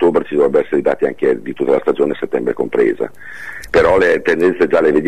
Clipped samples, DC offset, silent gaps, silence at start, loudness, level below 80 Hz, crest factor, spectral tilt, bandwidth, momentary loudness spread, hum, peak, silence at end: under 0.1%; 2%; none; 0 s; -15 LUFS; -44 dBFS; 12 dB; -6.5 dB/octave; 12.5 kHz; 8 LU; none; -2 dBFS; 0 s